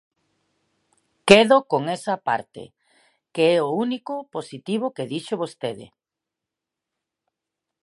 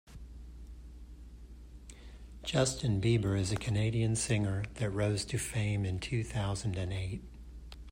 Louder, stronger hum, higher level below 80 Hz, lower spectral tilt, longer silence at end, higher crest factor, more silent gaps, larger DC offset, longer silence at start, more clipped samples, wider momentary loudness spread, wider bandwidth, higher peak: first, -21 LUFS vs -33 LUFS; neither; second, -64 dBFS vs -48 dBFS; about the same, -4.5 dB/octave vs -5 dB/octave; first, 1.95 s vs 0 s; first, 24 dB vs 18 dB; neither; neither; first, 1.25 s vs 0.05 s; neither; second, 19 LU vs 22 LU; second, 11.5 kHz vs 16 kHz; first, 0 dBFS vs -16 dBFS